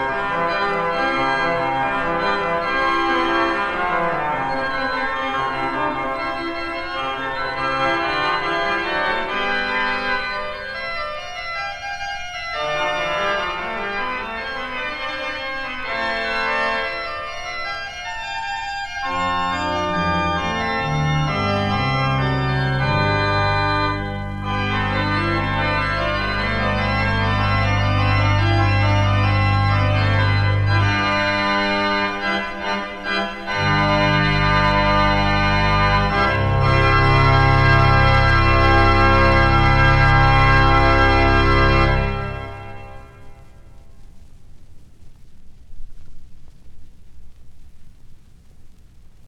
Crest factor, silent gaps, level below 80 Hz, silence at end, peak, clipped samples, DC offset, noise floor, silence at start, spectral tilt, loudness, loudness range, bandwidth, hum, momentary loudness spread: 18 dB; none; -28 dBFS; 0 s; -2 dBFS; under 0.1%; under 0.1%; -42 dBFS; 0 s; -6 dB/octave; -19 LUFS; 9 LU; 9 kHz; none; 11 LU